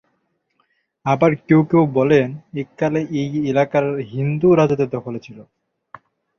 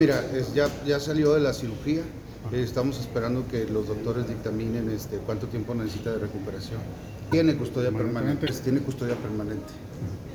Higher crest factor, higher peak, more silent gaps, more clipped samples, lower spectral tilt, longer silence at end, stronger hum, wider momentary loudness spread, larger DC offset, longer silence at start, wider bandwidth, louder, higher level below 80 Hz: about the same, 16 dB vs 18 dB; first, -2 dBFS vs -10 dBFS; neither; neither; first, -8.5 dB/octave vs -6.5 dB/octave; first, 0.95 s vs 0 s; neither; about the same, 13 LU vs 12 LU; neither; first, 1.05 s vs 0 s; second, 6.8 kHz vs over 20 kHz; first, -18 LUFS vs -28 LUFS; second, -56 dBFS vs -46 dBFS